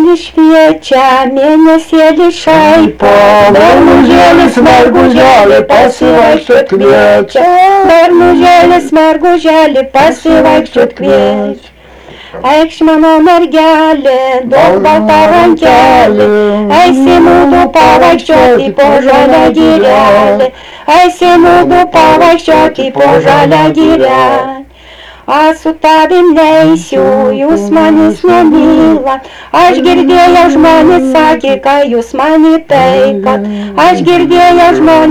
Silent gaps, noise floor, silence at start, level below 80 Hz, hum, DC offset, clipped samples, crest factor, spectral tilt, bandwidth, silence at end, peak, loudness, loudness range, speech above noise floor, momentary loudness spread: none; -31 dBFS; 0 s; -34 dBFS; none; 0.7%; 3%; 4 dB; -5.5 dB/octave; 16.5 kHz; 0 s; 0 dBFS; -5 LUFS; 4 LU; 27 dB; 5 LU